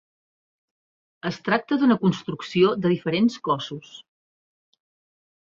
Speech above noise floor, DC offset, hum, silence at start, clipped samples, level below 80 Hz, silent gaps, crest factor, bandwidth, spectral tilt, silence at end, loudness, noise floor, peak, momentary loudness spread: over 68 dB; under 0.1%; none; 1.25 s; under 0.1%; -64 dBFS; none; 20 dB; 7.6 kHz; -6.5 dB/octave; 1.4 s; -23 LUFS; under -90 dBFS; -6 dBFS; 12 LU